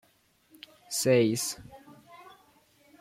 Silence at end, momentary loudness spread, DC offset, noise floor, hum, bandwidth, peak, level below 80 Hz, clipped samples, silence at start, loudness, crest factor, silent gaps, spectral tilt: 0.8 s; 27 LU; under 0.1%; -66 dBFS; none; 16.5 kHz; -12 dBFS; -68 dBFS; under 0.1%; 0.9 s; -27 LUFS; 20 dB; none; -4 dB/octave